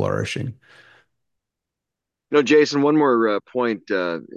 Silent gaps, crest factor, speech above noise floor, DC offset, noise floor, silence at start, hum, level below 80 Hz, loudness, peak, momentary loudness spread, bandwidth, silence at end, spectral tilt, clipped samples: none; 16 dB; 65 dB; under 0.1%; -84 dBFS; 0 s; none; -56 dBFS; -19 LUFS; -4 dBFS; 10 LU; 9.8 kHz; 0.15 s; -5.5 dB/octave; under 0.1%